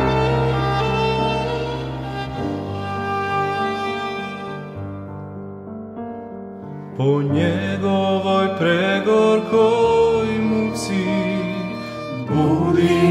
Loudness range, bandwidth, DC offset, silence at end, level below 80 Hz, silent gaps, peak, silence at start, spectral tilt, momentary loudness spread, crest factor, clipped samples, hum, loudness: 9 LU; 13.5 kHz; under 0.1%; 0 s; -42 dBFS; none; -4 dBFS; 0 s; -6.5 dB/octave; 16 LU; 16 dB; under 0.1%; none; -20 LUFS